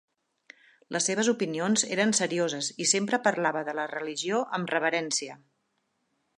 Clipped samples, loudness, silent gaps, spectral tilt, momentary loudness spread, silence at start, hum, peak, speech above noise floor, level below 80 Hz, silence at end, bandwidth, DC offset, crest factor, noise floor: under 0.1%; -27 LUFS; none; -2.5 dB/octave; 8 LU; 0.9 s; none; -10 dBFS; 48 dB; -80 dBFS; 1 s; 11.5 kHz; under 0.1%; 20 dB; -76 dBFS